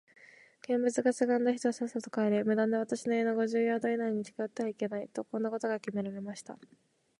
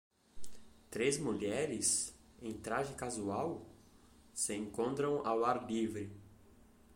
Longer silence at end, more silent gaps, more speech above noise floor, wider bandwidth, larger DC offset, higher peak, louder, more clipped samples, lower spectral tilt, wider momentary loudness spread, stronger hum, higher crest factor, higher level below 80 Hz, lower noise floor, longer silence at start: first, 0.55 s vs 0 s; neither; about the same, 25 dB vs 26 dB; second, 11.5 kHz vs 16.5 kHz; neither; first, -16 dBFS vs -20 dBFS; first, -32 LUFS vs -37 LUFS; neither; first, -5.5 dB/octave vs -3.5 dB/octave; second, 10 LU vs 15 LU; neither; about the same, 18 dB vs 18 dB; second, -82 dBFS vs -66 dBFS; second, -56 dBFS vs -63 dBFS; first, 0.7 s vs 0.35 s